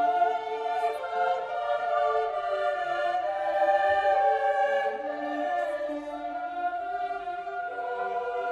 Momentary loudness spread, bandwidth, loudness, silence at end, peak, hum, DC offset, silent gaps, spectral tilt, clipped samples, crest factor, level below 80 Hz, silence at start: 10 LU; 10.5 kHz; -28 LUFS; 0 s; -12 dBFS; none; under 0.1%; none; -4 dB/octave; under 0.1%; 14 dB; -66 dBFS; 0 s